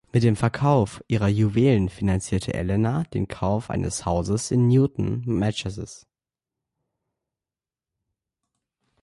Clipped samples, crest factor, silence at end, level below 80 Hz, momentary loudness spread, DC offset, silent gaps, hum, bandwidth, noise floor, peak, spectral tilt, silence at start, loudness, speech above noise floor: under 0.1%; 16 dB; 3.05 s; -42 dBFS; 8 LU; under 0.1%; none; none; 11.5 kHz; under -90 dBFS; -8 dBFS; -7 dB/octave; 0.15 s; -23 LUFS; over 68 dB